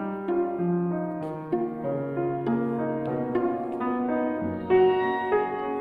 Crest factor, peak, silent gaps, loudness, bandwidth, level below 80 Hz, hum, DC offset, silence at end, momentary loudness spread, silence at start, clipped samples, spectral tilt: 16 dB; -10 dBFS; none; -27 LUFS; 4.1 kHz; -62 dBFS; none; under 0.1%; 0 s; 8 LU; 0 s; under 0.1%; -10 dB/octave